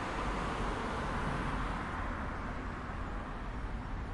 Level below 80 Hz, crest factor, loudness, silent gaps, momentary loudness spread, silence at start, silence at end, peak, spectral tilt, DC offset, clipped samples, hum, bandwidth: -42 dBFS; 14 dB; -38 LUFS; none; 6 LU; 0 s; 0 s; -24 dBFS; -6 dB/octave; under 0.1%; under 0.1%; none; 11.5 kHz